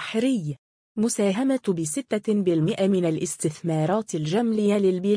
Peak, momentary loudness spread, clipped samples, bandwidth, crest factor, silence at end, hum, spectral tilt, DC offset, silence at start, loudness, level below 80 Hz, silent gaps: -12 dBFS; 5 LU; under 0.1%; 10.5 kHz; 12 dB; 0 s; none; -6 dB/octave; under 0.1%; 0 s; -24 LUFS; -66 dBFS; 0.59-0.95 s